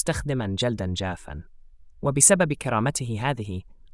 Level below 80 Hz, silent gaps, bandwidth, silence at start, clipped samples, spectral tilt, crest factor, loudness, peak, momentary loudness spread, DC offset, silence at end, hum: -46 dBFS; none; 12 kHz; 0 s; under 0.1%; -4 dB/octave; 22 dB; -23 LUFS; -4 dBFS; 20 LU; under 0.1%; 0.2 s; none